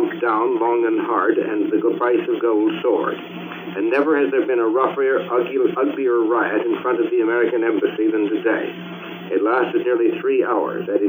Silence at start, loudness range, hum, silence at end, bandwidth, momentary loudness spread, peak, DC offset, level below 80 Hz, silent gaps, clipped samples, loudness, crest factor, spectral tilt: 0 s; 1 LU; none; 0 s; 16 kHz; 6 LU; -4 dBFS; under 0.1%; -80 dBFS; none; under 0.1%; -19 LUFS; 14 dB; -8 dB/octave